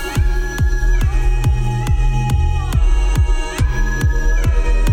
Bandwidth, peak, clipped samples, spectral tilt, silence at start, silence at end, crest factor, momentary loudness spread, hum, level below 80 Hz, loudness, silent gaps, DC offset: 13.5 kHz; -6 dBFS; under 0.1%; -5.5 dB/octave; 0 s; 0 s; 8 dB; 2 LU; none; -16 dBFS; -18 LUFS; none; under 0.1%